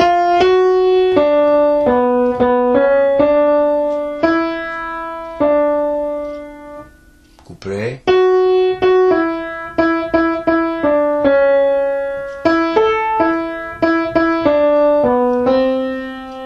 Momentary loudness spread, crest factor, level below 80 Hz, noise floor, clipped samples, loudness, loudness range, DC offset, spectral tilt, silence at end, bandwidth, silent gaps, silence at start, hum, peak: 11 LU; 14 dB; -44 dBFS; -46 dBFS; under 0.1%; -14 LUFS; 6 LU; under 0.1%; -6.5 dB/octave; 0 s; 7.2 kHz; none; 0 s; none; 0 dBFS